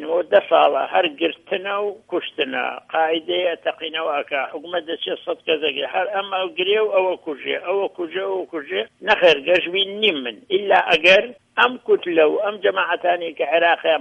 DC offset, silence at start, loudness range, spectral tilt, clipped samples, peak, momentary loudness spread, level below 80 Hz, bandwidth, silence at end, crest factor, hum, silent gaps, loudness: under 0.1%; 0 s; 6 LU; -4 dB/octave; under 0.1%; 0 dBFS; 11 LU; -66 dBFS; 8.6 kHz; 0 s; 18 dB; none; none; -20 LUFS